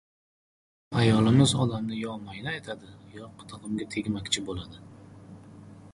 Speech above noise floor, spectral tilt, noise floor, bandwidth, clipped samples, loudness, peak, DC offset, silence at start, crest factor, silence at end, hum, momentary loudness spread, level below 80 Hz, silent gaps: 21 dB; -5.5 dB/octave; -48 dBFS; 11.5 kHz; under 0.1%; -27 LUFS; -8 dBFS; under 0.1%; 0.9 s; 20 dB; 0.05 s; none; 27 LU; -54 dBFS; none